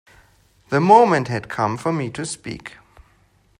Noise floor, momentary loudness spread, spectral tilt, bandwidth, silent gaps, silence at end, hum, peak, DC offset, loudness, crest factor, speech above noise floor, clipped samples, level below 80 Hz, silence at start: -58 dBFS; 20 LU; -6 dB/octave; 12 kHz; none; 0.9 s; none; 0 dBFS; under 0.1%; -18 LUFS; 20 dB; 40 dB; under 0.1%; -56 dBFS; 0.7 s